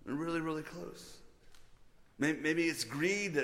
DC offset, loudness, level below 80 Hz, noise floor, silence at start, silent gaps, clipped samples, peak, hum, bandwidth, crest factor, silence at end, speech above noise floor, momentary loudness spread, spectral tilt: under 0.1%; -35 LUFS; -64 dBFS; -59 dBFS; 0.05 s; none; under 0.1%; -20 dBFS; none; 16.5 kHz; 18 dB; 0 s; 24 dB; 16 LU; -4.5 dB/octave